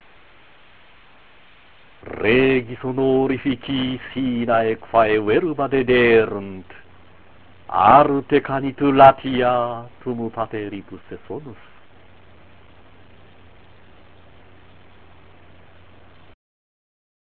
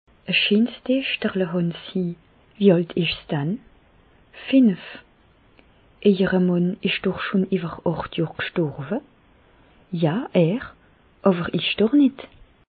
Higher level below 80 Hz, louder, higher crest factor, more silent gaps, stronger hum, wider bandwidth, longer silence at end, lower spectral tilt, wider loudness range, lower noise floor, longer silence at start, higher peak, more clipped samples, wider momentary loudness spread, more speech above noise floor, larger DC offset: first, -50 dBFS vs -56 dBFS; first, -18 LUFS vs -22 LUFS; about the same, 22 dB vs 20 dB; neither; neither; about the same, 4.6 kHz vs 4.8 kHz; first, 5.75 s vs 0.45 s; second, -9.5 dB/octave vs -11 dB/octave; first, 14 LU vs 4 LU; second, -51 dBFS vs -56 dBFS; second, 0.05 s vs 0.3 s; first, 0 dBFS vs -4 dBFS; neither; first, 22 LU vs 12 LU; about the same, 33 dB vs 35 dB; first, 0.6% vs under 0.1%